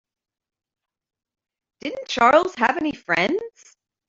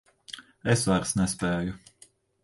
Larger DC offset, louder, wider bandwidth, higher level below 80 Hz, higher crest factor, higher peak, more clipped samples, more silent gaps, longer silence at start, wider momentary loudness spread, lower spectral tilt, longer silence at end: neither; first, -20 LUFS vs -27 LUFS; second, 7.8 kHz vs 11.5 kHz; second, -62 dBFS vs -50 dBFS; about the same, 22 dB vs 18 dB; first, -2 dBFS vs -10 dBFS; neither; neither; first, 1.85 s vs 0.3 s; second, 16 LU vs 19 LU; about the same, -4 dB/octave vs -5 dB/octave; about the same, 0.6 s vs 0.65 s